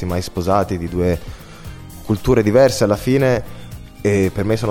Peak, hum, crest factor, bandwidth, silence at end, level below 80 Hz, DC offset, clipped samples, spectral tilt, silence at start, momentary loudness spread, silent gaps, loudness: -2 dBFS; none; 16 dB; 17 kHz; 0 s; -36 dBFS; under 0.1%; under 0.1%; -6.5 dB/octave; 0 s; 22 LU; none; -17 LUFS